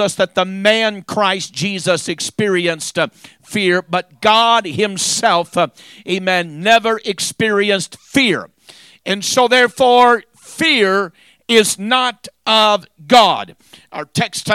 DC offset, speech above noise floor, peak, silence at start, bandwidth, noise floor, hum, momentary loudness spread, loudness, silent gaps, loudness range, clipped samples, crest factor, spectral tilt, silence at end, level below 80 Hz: under 0.1%; 29 dB; 0 dBFS; 0 s; 16 kHz; -44 dBFS; none; 11 LU; -15 LUFS; none; 3 LU; under 0.1%; 16 dB; -3 dB/octave; 0 s; -58 dBFS